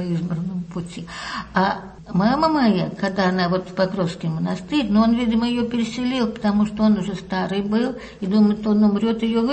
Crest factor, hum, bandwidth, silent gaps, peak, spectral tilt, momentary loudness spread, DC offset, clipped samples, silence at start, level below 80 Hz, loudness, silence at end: 14 dB; none; 8.6 kHz; none; -6 dBFS; -7 dB/octave; 10 LU; under 0.1%; under 0.1%; 0 s; -48 dBFS; -21 LUFS; 0 s